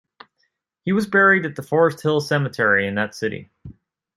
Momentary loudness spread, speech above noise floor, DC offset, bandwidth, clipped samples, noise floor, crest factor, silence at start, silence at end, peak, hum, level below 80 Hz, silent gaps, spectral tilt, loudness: 13 LU; 52 dB; under 0.1%; 13.5 kHz; under 0.1%; -71 dBFS; 18 dB; 0.85 s; 0.45 s; -4 dBFS; none; -60 dBFS; none; -6 dB/octave; -19 LUFS